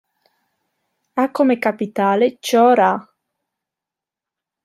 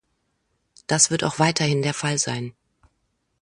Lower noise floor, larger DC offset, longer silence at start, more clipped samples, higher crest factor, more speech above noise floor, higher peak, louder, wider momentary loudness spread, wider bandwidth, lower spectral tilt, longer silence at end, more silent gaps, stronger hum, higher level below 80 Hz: first, -87 dBFS vs -72 dBFS; neither; first, 1.15 s vs 0.9 s; neither; second, 16 dB vs 24 dB; first, 71 dB vs 50 dB; about the same, -2 dBFS vs -2 dBFS; first, -17 LUFS vs -21 LUFS; second, 8 LU vs 14 LU; first, 14.5 kHz vs 11.5 kHz; first, -5 dB/octave vs -3.5 dB/octave; first, 1.65 s vs 0.9 s; neither; neither; second, -72 dBFS vs -60 dBFS